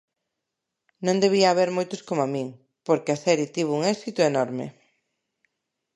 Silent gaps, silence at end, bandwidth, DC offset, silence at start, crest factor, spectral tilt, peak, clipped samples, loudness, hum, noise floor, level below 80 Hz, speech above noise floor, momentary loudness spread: none; 1.25 s; 11.5 kHz; under 0.1%; 1 s; 20 dB; -5 dB/octave; -4 dBFS; under 0.1%; -24 LUFS; none; -83 dBFS; -76 dBFS; 60 dB; 12 LU